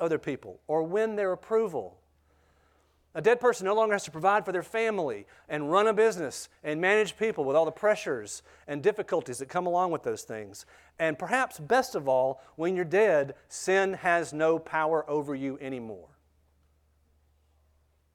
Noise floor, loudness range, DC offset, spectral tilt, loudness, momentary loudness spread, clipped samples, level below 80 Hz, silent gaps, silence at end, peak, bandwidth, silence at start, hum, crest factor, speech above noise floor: -68 dBFS; 5 LU; under 0.1%; -4.5 dB/octave; -28 LUFS; 13 LU; under 0.1%; -68 dBFS; none; 2.1 s; -10 dBFS; 15.5 kHz; 0 s; none; 18 dB; 40 dB